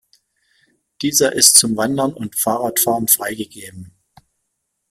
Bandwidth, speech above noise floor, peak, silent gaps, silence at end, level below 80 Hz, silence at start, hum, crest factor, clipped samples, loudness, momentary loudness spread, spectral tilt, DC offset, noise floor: 16.5 kHz; 57 dB; 0 dBFS; none; 1 s; -58 dBFS; 1 s; none; 20 dB; under 0.1%; -14 LUFS; 20 LU; -2 dB/octave; under 0.1%; -74 dBFS